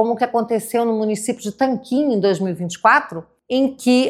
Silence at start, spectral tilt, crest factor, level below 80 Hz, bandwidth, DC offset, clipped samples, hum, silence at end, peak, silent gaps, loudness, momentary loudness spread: 0 s; -5 dB/octave; 18 dB; -64 dBFS; 15 kHz; under 0.1%; under 0.1%; none; 0 s; -2 dBFS; none; -19 LUFS; 9 LU